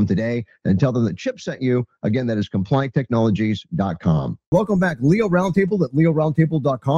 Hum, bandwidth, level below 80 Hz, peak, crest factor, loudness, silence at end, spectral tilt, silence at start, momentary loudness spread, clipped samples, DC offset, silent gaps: none; 7.4 kHz; -48 dBFS; -4 dBFS; 14 dB; -20 LUFS; 0 s; -8.5 dB/octave; 0 s; 6 LU; under 0.1%; under 0.1%; 4.46-4.52 s